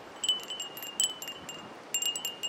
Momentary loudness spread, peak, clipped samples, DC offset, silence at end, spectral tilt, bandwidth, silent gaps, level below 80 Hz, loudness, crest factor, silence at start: 12 LU; -10 dBFS; under 0.1%; under 0.1%; 0 s; 1 dB/octave; 17 kHz; none; -76 dBFS; -32 LUFS; 24 dB; 0 s